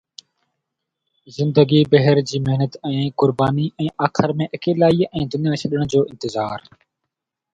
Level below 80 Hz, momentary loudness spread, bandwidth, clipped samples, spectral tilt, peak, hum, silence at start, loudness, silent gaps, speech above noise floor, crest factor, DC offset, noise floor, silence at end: -52 dBFS; 10 LU; 7.8 kHz; under 0.1%; -7 dB/octave; 0 dBFS; none; 1.3 s; -19 LUFS; none; 62 dB; 18 dB; under 0.1%; -80 dBFS; 0.95 s